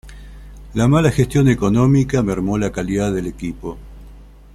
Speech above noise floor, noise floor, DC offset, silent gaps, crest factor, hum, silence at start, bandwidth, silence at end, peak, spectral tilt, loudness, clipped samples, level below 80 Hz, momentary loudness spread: 24 dB; -40 dBFS; under 0.1%; none; 16 dB; 50 Hz at -35 dBFS; 0.05 s; 13 kHz; 0.3 s; -2 dBFS; -7 dB/octave; -17 LUFS; under 0.1%; -36 dBFS; 13 LU